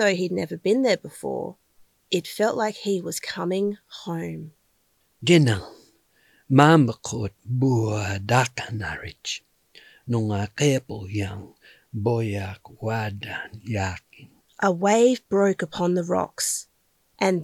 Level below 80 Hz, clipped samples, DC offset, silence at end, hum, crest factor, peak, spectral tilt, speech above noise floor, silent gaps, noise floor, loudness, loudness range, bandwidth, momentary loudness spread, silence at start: -62 dBFS; under 0.1%; under 0.1%; 0 s; none; 24 dB; -2 dBFS; -5.5 dB/octave; 44 dB; none; -67 dBFS; -24 LUFS; 6 LU; 16 kHz; 15 LU; 0 s